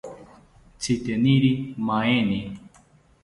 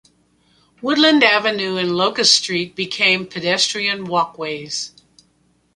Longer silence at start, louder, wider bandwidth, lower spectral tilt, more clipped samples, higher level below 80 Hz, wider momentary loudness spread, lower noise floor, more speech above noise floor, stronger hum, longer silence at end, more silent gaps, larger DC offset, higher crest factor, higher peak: second, 0.05 s vs 0.8 s; second, -23 LUFS vs -16 LUFS; about the same, 11.5 kHz vs 11.5 kHz; first, -6 dB/octave vs -2.5 dB/octave; neither; first, -54 dBFS vs -62 dBFS; first, 18 LU vs 13 LU; second, -56 dBFS vs -61 dBFS; second, 34 dB vs 43 dB; neither; second, 0.55 s vs 0.85 s; neither; neither; about the same, 18 dB vs 20 dB; second, -8 dBFS vs 0 dBFS